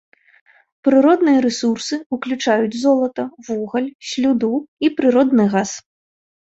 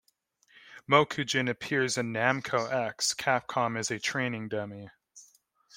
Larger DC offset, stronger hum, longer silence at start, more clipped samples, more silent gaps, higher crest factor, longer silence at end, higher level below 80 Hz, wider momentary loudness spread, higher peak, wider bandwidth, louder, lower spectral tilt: neither; neither; first, 0.85 s vs 0.65 s; neither; first, 2.06-2.10 s, 3.95-3.99 s, 4.68-4.77 s vs none; second, 16 dB vs 24 dB; first, 0.8 s vs 0.55 s; first, -62 dBFS vs -72 dBFS; about the same, 11 LU vs 11 LU; first, -2 dBFS vs -8 dBFS; second, 8 kHz vs 16.5 kHz; first, -18 LUFS vs -29 LUFS; first, -5 dB/octave vs -3.5 dB/octave